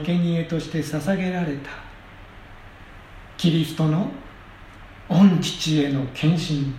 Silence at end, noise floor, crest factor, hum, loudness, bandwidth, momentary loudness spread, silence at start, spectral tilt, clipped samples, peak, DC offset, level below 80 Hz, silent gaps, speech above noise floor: 0 s; -43 dBFS; 18 dB; none; -22 LUFS; 14.5 kHz; 22 LU; 0 s; -6.5 dB/octave; under 0.1%; -6 dBFS; under 0.1%; -48 dBFS; none; 22 dB